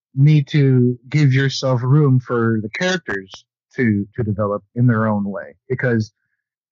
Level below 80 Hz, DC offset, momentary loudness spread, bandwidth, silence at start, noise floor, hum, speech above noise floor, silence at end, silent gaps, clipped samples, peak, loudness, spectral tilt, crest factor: -56 dBFS; under 0.1%; 12 LU; 7.4 kHz; 0.15 s; -75 dBFS; none; 58 dB; 0.65 s; none; under 0.1%; -4 dBFS; -18 LUFS; -7.5 dB/octave; 14 dB